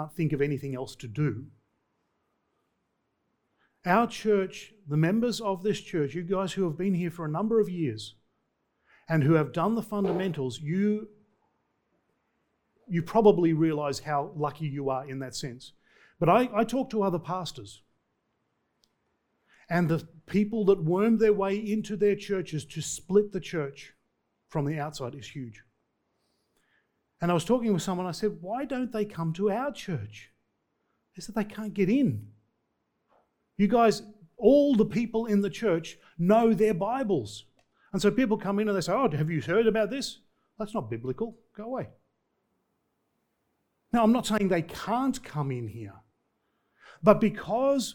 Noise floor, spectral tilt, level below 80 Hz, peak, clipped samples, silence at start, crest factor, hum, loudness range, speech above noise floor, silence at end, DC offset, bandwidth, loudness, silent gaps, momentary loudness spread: -77 dBFS; -6.5 dB/octave; -58 dBFS; -4 dBFS; under 0.1%; 0 s; 24 dB; none; 8 LU; 51 dB; 0 s; under 0.1%; 19 kHz; -28 LUFS; none; 14 LU